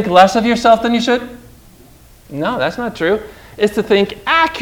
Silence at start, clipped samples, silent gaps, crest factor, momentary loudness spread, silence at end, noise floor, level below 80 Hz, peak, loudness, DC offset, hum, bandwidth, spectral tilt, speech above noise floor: 0 s; 0.3%; none; 16 dB; 11 LU; 0 s; -43 dBFS; -44 dBFS; 0 dBFS; -14 LUFS; under 0.1%; none; 20 kHz; -4.5 dB/octave; 29 dB